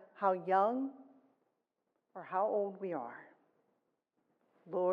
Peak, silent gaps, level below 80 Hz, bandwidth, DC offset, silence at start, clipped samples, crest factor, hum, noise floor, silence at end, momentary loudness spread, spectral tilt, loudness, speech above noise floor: -18 dBFS; none; under -90 dBFS; 5.4 kHz; under 0.1%; 0.15 s; under 0.1%; 20 dB; none; -85 dBFS; 0 s; 19 LU; -8.5 dB/octave; -35 LUFS; 50 dB